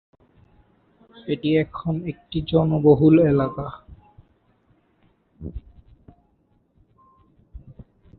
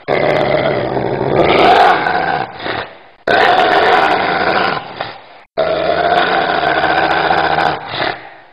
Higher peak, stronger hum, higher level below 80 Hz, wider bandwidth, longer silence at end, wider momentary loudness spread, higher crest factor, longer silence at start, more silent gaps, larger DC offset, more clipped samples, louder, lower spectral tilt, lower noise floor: second, -4 dBFS vs 0 dBFS; neither; about the same, -46 dBFS vs -44 dBFS; second, 4.5 kHz vs 10.5 kHz; first, 0.6 s vs 0.15 s; first, 24 LU vs 12 LU; first, 22 dB vs 14 dB; first, 1.25 s vs 0.1 s; neither; second, under 0.1% vs 0.4%; neither; second, -20 LUFS vs -13 LUFS; first, -12.5 dB/octave vs -5.5 dB/octave; first, -64 dBFS vs -34 dBFS